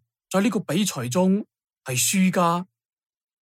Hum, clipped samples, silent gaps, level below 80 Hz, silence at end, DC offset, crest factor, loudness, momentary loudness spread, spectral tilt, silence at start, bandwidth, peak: none; under 0.1%; none; -70 dBFS; 0.8 s; under 0.1%; 16 dB; -23 LUFS; 14 LU; -4.5 dB/octave; 0.3 s; 16 kHz; -8 dBFS